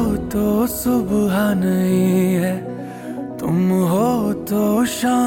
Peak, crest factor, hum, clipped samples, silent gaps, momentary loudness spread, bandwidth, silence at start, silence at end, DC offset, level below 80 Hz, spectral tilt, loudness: -6 dBFS; 12 dB; none; under 0.1%; none; 10 LU; 17 kHz; 0 s; 0 s; under 0.1%; -42 dBFS; -6.5 dB/octave; -18 LUFS